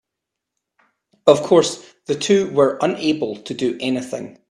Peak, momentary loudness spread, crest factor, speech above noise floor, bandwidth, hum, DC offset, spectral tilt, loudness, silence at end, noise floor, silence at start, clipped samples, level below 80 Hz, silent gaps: 0 dBFS; 12 LU; 20 dB; 64 dB; 12.5 kHz; none; under 0.1%; -4.5 dB/octave; -18 LUFS; 0.2 s; -82 dBFS; 1.25 s; under 0.1%; -62 dBFS; none